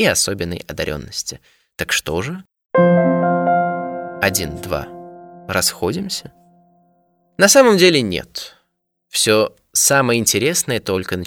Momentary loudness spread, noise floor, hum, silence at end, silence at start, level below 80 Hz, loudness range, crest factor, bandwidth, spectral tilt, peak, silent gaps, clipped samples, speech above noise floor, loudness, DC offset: 16 LU; -71 dBFS; none; 0 s; 0 s; -46 dBFS; 7 LU; 18 dB; 19 kHz; -3 dB/octave; 0 dBFS; none; under 0.1%; 54 dB; -17 LUFS; under 0.1%